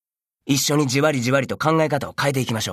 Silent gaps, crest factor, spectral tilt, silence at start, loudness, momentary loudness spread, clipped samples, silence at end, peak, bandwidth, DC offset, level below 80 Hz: none; 16 dB; -4.5 dB/octave; 0.45 s; -20 LUFS; 5 LU; under 0.1%; 0 s; -4 dBFS; 14 kHz; under 0.1%; -58 dBFS